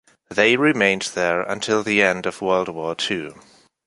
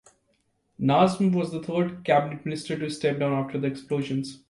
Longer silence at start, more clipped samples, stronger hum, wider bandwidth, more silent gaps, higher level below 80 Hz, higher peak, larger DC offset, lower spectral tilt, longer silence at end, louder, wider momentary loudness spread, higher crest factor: second, 0.3 s vs 0.8 s; neither; neither; about the same, 11.5 kHz vs 11.5 kHz; neither; first, -58 dBFS vs -64 dBFS; first, -2 dBFS vs -6 dBFS; neither; second, -4 dB/octave vs -7 dB/octave; first, 0.55 s vs 0.15 s; first, -20 LUFS vs -26 LUFS; about the same, 10 LU vs 10 LU; about the same, 20 dB vs 20 dB